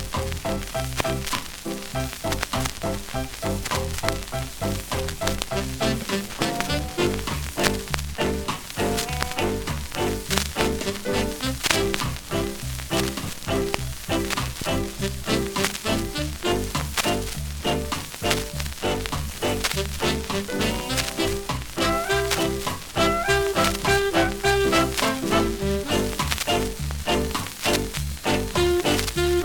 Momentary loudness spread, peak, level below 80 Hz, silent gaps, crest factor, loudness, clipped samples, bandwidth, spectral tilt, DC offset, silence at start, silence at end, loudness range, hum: 7 LU; 0 dBFS; -36 dBFS; none; 24 dB; -25 LUFS; under 0.1%; 19 kHz; -4 dB/octave; under 0.1%; 0 s; 0 s; 6 LU; none